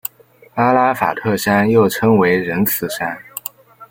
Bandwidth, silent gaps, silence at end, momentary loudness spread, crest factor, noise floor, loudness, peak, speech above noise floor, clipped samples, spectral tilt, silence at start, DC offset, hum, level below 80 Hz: 17 kHz; none; 0.05 s; 15 LU; 16 dB; -48 dBFS; -15 LUFS; 0 dBFS; 33 dB; under 0.1%; -5.5 dB/octave; 0.05 s; under 0.1%; none; -54 dBFS